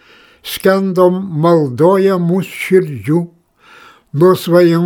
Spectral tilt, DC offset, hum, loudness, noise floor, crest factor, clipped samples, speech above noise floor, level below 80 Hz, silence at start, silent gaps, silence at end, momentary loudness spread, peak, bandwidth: -7 dB/octave; under 0.1%; none; -13 LUFS; -44 dBFS; 12 dB; under 0.1%; 32 dB; -58 dBFS; 0.45 s; none; 0 s; 9 LU; 0 dBFS; 19.5 kHz